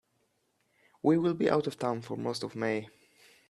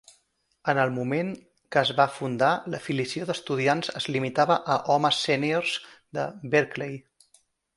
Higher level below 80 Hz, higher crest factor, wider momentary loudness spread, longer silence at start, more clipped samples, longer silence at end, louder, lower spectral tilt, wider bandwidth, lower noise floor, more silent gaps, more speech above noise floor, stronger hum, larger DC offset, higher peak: second, -74 dBFS vs -68 dBFS; about the same, 22 dB vs 22 dB; about the same, 8 LU vs 10 LU; first, 1.05 s vs 0.65 s; neither; second, 0.6 s vs 0.75 s; second, -31 LUFS vs -26 LUFS; first, -6.5 dB/octave vs -5 dB/octave; about the same, 12.5 kHz vs 11.5 kHz; first, -75 dBFS vs -70 dBFS; neither; about the same, 45 dB vs 44 dB; neither; neither; second, -12 dBFS vs -6 dBFS